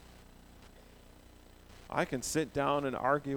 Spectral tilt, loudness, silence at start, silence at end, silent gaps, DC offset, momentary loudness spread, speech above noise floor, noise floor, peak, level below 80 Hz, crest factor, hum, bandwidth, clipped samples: -4.5 dB/octave; -33 LUFS; 0.1 s; 0 s; none; under 0.1%; 6 LU; 24 dB; -57 dBFS; -16 dBFS; -58 dBFS; 20 dB; 60 Hz at -60 dBFS; over 20 kHz; under 0.1%